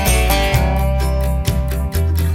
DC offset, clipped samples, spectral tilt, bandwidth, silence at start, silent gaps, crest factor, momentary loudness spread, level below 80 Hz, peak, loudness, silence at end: under 0.1%; under 0.1%; -5 dB/octave; 17 kHz; 0 s; none; 14 dB; 5 LU; -18 dBFS; -2 dBFS; -17 LUFS; 0 s